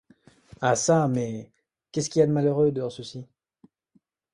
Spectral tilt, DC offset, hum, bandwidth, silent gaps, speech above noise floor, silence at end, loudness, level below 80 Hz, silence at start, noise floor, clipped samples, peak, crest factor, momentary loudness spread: -5.5 dB/octave; under 0.1%; none; 11.5 kHz; none; 43 dB; 1.1 s; -24 LUFS; -62 dBFS; 0.6 s; -67 dBFS; under 0.1%; -8 dBFS; 18 dB; 17 LU